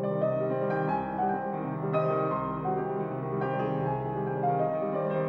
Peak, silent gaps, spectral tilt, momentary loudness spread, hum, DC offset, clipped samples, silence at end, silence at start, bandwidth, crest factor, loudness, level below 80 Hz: -16 dBFS; none; -10.5 dB/octave; 4 LU; none; under 0.1%; under 0.1%; 0 s; 0 s; 5.2 kHz; 14 dB; -30 LUFS; -60 dBFS